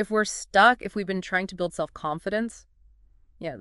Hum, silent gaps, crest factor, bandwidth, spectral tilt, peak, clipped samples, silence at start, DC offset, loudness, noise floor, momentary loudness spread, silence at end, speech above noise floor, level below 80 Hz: none; none; 22 dB; 11.5 kHz; -3.5 dB/octave; -4 dBFS; under 0.1%; 0 s; under 0.1%; -25 LUFS; -57 dBFS; 14 LU; 0 s; 32 dB; -56 dBFS